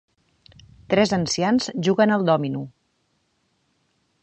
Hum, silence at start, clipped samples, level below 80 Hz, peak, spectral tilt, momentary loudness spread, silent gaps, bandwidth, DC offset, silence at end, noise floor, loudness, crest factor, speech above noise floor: none; 0.9 s; under 0.1%; -58 dBFS; -4 dBFS; -5 dB/octave; 10 LU; none; 8.8 kHz; under 0.1%; 1.55 s; -69 dBFS; -21 LUFS; 20 dB; 49 dB